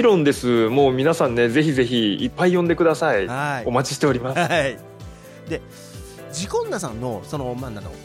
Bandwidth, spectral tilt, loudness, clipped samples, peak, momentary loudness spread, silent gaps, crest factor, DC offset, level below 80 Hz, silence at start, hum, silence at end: 16 kHz; -5.5 dB/octave; -20 LUFS; under 0.1%; -6 dBFS; 20 LU; none; 16 dB; under 0.1%; -46 dBFS; 0 s; none; 0 s